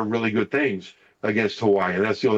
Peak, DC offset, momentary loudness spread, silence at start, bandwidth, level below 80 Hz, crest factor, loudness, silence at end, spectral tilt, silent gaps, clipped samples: -10 dBFS; under 0.1%; 6 LU; 0 s; 7.8 kHz; -70 dBFS; 12 dB; -23 LUFS; 0 s; -6.5 dB/octave; none; under 0.1%